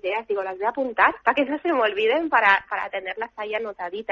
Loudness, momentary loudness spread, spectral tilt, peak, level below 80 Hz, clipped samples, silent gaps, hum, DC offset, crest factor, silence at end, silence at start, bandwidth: -23 LUFS; 11 LU; -4.5 dB/octave; -4 dBFS; -62 dBFS; under 0.1%; none; none; under 0.1%; 20 dB; 0.1 s; 0 s; 7.4 kHz